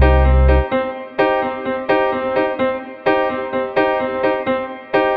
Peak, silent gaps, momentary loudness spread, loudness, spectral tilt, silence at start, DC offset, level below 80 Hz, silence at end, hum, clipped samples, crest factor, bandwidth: 0 dBFS; none; 8 LU; -18 LUFS; -9.5 dB/octave; 0 s; under 0.1%; -22 dBFS; 0 s; none; under 0.1%; 16 dB; 4.8 kHz